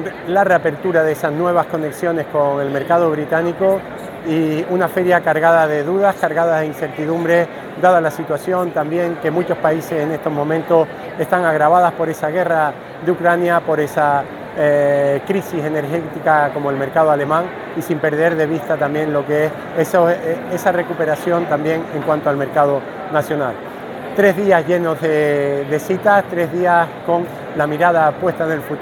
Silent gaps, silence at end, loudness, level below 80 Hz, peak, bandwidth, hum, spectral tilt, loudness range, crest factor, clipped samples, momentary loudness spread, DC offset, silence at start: none; 0 s; -17 LUFS; -56 dBFS; 0 dBFS; 19 kHz; none; -6.5 dB/octave; 2 LU; 16 dB; under 0.1%; 7 LU; under 0.1%; 0 s